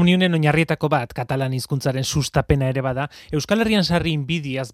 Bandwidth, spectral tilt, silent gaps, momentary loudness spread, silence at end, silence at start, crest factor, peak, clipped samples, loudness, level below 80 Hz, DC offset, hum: 15.5 kHz; -5.5 dB/octave; none; 7 LU; 0 s; 0 s; 18 dB; -2 dBFS; under 0.1%; -21 LUFS; -40 dBFS; under 0.1%; none